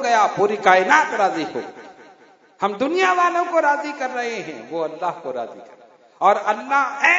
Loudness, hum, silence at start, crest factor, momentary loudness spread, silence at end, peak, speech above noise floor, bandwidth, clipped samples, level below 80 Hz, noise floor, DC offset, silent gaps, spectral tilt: -19 LUFS; none; 0 s; 20 dB; 14 LU; 0 s; 0 dBFS; 32 dB; 7.8 kHz; under 0.1%; -74 dBFS; -51 dBFS; under 0.1%; none; -3.5 dB/octave